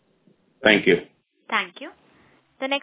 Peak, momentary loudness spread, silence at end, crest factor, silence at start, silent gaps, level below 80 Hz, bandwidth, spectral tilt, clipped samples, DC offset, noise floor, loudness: -2 dBFS; 20 LU; 0.05 s; 24 dB; 0.6 s; none; -60 dBFS; 4 kHz; -8 dB/octave; under 0.1%; under 0.1%; -62 dBFS; -21 LUFS